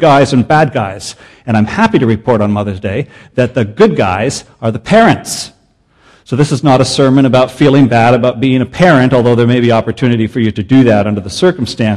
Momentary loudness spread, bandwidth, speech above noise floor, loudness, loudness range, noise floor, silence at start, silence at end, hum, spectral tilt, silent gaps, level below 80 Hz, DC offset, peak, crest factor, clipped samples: 11 LU; 12 kHz; 41 dB; -10 LUFS; 4 LU; -51 dBFS; 0 s; 0 s; none; -6.5 dB/octave; none; -42 dBFS; 0.4%; 0 dBFS; 10 dB; 0.4%